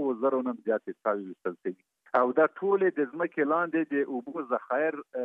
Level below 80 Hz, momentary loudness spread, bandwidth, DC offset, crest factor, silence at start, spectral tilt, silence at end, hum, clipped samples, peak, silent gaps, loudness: -86 dBFS; 10 LU; 4 kHz; under 0.1%; 20 dB; 0 s; -9 dB/octave; 0 s; none; under 0.1%; -8 dBFS; none; -29 LUFS